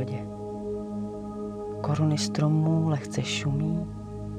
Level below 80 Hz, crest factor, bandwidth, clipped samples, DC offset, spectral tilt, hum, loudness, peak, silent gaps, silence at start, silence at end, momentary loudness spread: -50 dBFS; 14 dB; 10 kHz; under 0.1%; under 0.1%; -6 dB/octave; none; -28 LUFS; -14 dBFS; none; 0 s; 0 s; 11 LU